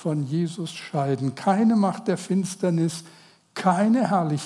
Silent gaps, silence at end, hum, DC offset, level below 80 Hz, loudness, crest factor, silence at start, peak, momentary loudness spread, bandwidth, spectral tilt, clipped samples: none; 0 s; none; under 0.1%; -78 dBFS; -24 LUFS; 18 dB; 0 s; -6 dBFS; 9 LU; 12 kHz; -6.5 dB/octave; under 0.1%